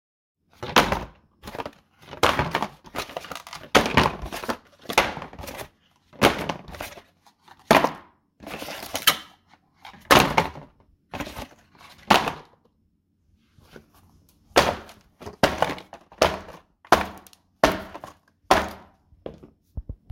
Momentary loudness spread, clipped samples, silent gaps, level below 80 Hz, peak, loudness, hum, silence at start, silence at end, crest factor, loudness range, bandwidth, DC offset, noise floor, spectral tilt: 23 LU; under 0.1%; none; -46 dBFS; 0 dBFS; -23 LUFS; none; 0.6 s; 0.2 s; 26 dB; 4 LU; 17 kHz; under 0.1%; -68 dBFS; -3.5 dB/octave